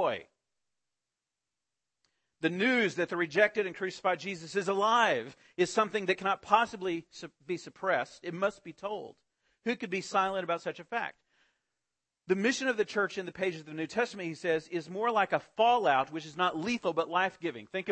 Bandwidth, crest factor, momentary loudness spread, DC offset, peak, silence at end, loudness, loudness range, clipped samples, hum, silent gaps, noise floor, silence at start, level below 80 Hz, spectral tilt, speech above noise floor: 8.8 kHz; 22 dB; 12 LU; under 0.1%; -10 dBFS; 0 s; -31 LUFS; 6 LU; under 0.1%; none; none; -89 dBFS; 0 s; -74 dBFS; -4 dB/octave; 58 dB